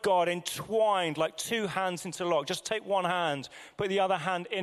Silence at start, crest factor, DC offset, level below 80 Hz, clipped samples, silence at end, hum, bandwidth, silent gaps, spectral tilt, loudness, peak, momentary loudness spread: 0 s; 16 dB; under 0.1%; -68 dBFS; under 0.1%; 0 s; none; 15.5 kHz; none; -3.5 dB/octave; -30 LUFS; -14 dBFS; 7 LU